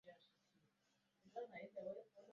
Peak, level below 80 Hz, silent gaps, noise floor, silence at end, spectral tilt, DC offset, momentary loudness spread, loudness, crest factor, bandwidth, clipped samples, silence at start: -38 dBFS; under -90 dBFS; none; -84 dBFS; 0 s; -4 dB/octave; under 0.1%; 5 LU; -54 LUFS; 20 dB; 7.2 kHz; under 0.1%; 0.05 s